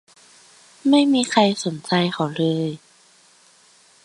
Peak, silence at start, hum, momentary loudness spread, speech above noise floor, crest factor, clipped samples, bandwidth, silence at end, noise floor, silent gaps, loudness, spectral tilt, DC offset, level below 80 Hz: 0 dBFS; 0.85 s; none; 10 LU; 35 dB; 22 dB; under 0.1%; 11.5 kHz; 1.25 s; -54 dBFS; none; -20 LUFS; -5 dB/octave; under 0.1%; -68 dBFS